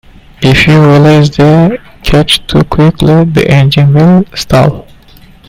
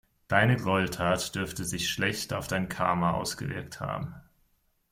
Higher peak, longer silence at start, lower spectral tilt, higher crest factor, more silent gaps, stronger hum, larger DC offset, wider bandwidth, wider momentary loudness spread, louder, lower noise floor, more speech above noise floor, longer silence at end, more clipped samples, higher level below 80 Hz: first, 0 dBFS vs -8 dBFS; about the same, 0.4 s vs 0.3 s; first, -6.5 dB/octave vs -4.5 dB/octave; second, 6 dB vs 22 dB; neither; neither; neither; about the same, 15.5 kHz vs 16.5 kHz; second, 7 LU vs 11 LU; first, -6 LUFS vs -29 LUFS; second, -36 dBFS vs -70 dBFS; second, 30 dB vs 41 dB; about the same, 0.7 s vs 0.7 s; first, 2% vs under 0.1%; first, -26 dBFS vs -54 dBFS